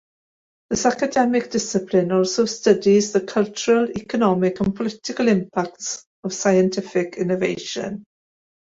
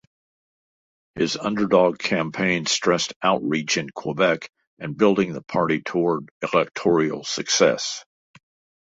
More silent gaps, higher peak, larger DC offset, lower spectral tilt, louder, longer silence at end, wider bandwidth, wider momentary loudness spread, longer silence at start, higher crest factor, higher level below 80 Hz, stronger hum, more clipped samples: second, 6.06-6.23 s vs 3.16-3.21 s, 4.67-4.77 s, 6.31-6.41 s; about the same, -2 dBFS vs -2 dBFS; neither; about the same, -5 dB/octave vs -4 dB/octave; about the same, -21 LUFS vs -22 LUFS; second, 0.6 s vs 0.8 s; about the same, 8 kHz vs 8 kHz; about the same, 10 LU vs 10 LU; second, 0.7 s vs 1.15 s; about the same, 18 dB vs 20 dB; about the same, -56 dBFS vs -60 dBFS; neither; neither